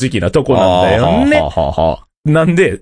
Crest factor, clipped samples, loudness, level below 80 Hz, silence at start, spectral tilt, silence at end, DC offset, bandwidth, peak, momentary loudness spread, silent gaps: 12 dB; under 0.1%; -12 LUFS; -30 dBFS; 0 s; -6.5 dB/octave; 0.05 s; under 0.1%; 10.5 kHz; 0 dBFS; 6 LU; 2.17-2.23 s